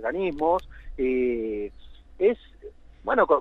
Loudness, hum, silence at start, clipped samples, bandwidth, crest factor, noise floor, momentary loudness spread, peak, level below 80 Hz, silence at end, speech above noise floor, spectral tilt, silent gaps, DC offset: -26 LUFS; none; 0 s; under 0.1%; 5.2 kHz; 20 dB; -46 dBFS; 14 LU; -6 dBFS; -46 dBFS; 0 s; 22 dB; -7.5 dB/octave; none; under 0.1%